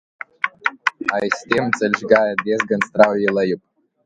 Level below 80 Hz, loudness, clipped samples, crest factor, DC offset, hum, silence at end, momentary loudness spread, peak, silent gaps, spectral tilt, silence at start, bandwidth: -62 dBFS; -19 LUFS; under 0.1%; 20 dB; under 0.1%; none; 0.5 s; 9 LU; 0 dBFS; none; -5 dB/octave; 0.45 s; 10.5 kHz